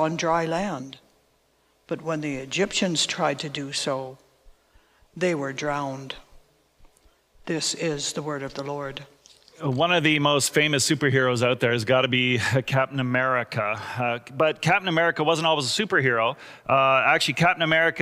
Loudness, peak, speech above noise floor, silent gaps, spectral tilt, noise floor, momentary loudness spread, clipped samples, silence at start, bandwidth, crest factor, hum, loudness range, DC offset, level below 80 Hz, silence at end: -23 LUFS; -6 dBFS; 41 dB; none; -4 dB/octave; -65 dBFS; 12 LU; under 0.1%; 0 s; 16 kHz; 18 dB; none; 10 LU; under 0.1%; -60 dBFS; 0 s